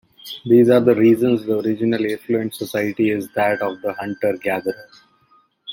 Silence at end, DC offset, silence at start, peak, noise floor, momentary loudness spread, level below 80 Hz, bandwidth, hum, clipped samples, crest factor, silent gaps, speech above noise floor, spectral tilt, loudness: 0 s; under 0.1%; 0.25 s; -2 dBFS; -58 dBFS; 13 LU; -62 dBFS; 17 kHz; none; under 0.1%; 16 dB; none; 40 dB; -6.5 dB/octave; -18 LUFS